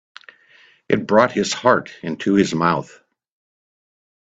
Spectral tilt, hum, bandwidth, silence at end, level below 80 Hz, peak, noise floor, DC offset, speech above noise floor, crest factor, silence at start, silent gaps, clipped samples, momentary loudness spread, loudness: -5 dB/octave; none; 8.6 kHz; 1.4 s; -58 dBFS; 0 dBFS; -53 dBFS; under 0.1%; 35 dB; 20 dB; 0.9 s; none; under 0.1%; 9 LU; -18 LUFS